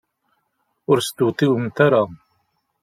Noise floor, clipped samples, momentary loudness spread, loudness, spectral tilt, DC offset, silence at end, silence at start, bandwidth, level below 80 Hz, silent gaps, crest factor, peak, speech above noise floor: -71 dBFS; under 0.1%; 8 LU; -19 LUFS; -6 dB/octave; under 0.1%; 0.7 s; 0.9 s; 15.5 kHz; -62 dBFS; none; 18 dB; -2 dBFS; 53 dB